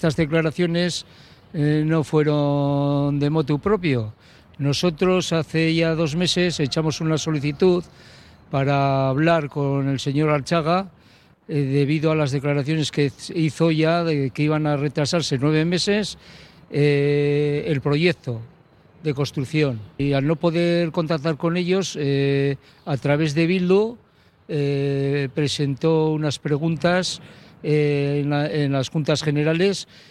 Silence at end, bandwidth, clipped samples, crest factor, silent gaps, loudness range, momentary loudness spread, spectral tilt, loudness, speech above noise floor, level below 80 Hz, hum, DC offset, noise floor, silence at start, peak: 0.25 s; 12 kHz; under 0.1%; 16 dB; none; 1 LU; 6 LU; -6 dB/octave; -21 LUFS; 32 dB; -52 dBFS; none; under 0.1%; -53 dBFS; 0 s; -6 dBFS